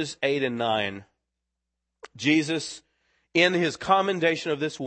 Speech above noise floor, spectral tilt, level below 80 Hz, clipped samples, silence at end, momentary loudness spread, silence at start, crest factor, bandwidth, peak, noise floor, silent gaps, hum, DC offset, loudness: 58 dB; -4.5 dB/octave; -66 dBFS; under 0.1%; 0 s; 10 LU; 0 s; 20 dB; 8.8 kHz; -6 dBFS; -83 dBFS; none; none; under 0.1%; -24 LUFS